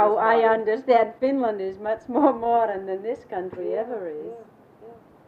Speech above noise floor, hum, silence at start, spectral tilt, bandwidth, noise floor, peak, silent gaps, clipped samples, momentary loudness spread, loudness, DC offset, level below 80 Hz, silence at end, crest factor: 25 dB; none; 0 s; -7 dB/octave; 5.2 kHz; -47 dBFS; -6 dBFS; none; under 0.1%; 13 LU; -23 LUFS; under 0.1%; -66 dBFS; 0.3 s; 18 dB